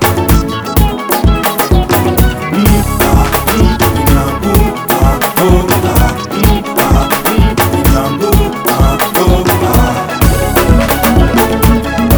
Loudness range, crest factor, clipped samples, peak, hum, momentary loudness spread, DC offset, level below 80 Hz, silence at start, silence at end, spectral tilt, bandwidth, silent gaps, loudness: 1 LU; 10 dB; 0.5%; 0 dBFS; none; 3 LU; under 0.1%; -14 dBFS; 0 s; 0 s; -5.5 dB/octave; over 20 kHz; none; -10 LUFS